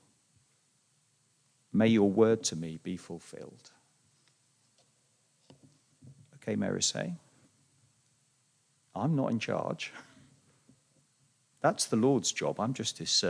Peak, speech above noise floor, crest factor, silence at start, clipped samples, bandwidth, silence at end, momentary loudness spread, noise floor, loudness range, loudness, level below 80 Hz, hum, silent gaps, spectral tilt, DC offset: -12 dBFS; 41 dB; 22 dB; 1.75 s; under 0.1%; 10.5 kHz; 0 s; 20 LU; -71 dBFS; 11 LU; -30 LUFS; -78 dBFS; none; none; -4 dB/octave; under 0.1%